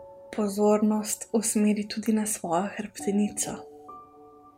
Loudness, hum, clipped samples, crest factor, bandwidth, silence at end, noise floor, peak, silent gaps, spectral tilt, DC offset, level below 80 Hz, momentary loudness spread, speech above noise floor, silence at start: -27 LUFS; none; under 0.1%; 16 dB; 16 kHz; 0.1 s; -52 dBFS; -12 dBFS; none; -4.5 dB/octave; under 0.1%; -66 dBFS; 18 LU; 26 dB; 0 s